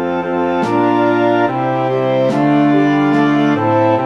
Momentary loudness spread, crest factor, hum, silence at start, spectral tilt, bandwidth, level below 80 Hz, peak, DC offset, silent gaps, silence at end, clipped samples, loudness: 4 LU; 12 dB; none; 0 s; -8 dB/octave; 7.4 kHz; -60 dBFS; -2 dBFS; 0.3%; none; 0 s; under 0.1%; -14 LUFS